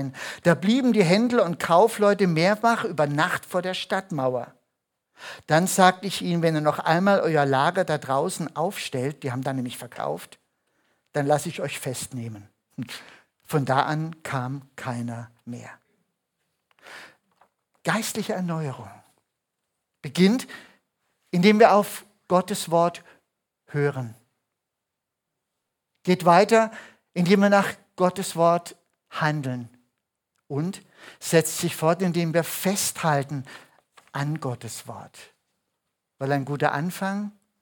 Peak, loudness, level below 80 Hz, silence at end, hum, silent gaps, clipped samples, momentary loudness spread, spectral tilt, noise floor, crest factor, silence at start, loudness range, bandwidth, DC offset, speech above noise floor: -2 dBFS; -23 LUFS; -72 dBFS; 0.3 s; none; none; under 0.1%; 19 LU; -5 dB/octave; -83 dBFS; 22 dB; 0 s; 10 LU; 19 kHz; under 0.1%; 60 dB